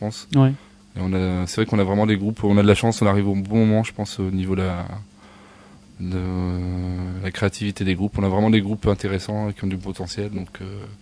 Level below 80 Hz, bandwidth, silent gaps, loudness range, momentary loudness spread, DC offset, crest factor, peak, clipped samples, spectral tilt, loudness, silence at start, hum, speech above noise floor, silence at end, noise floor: -44 dBFS; 11 kHz; none; 8 LU; 12 LU; under 0.1%; 20 dB; -2 dBFS; under 0.1%; -7 dB/octave; -22 LUFS; 0 s; none; 26 dB; 0.05 s; -47 dBFS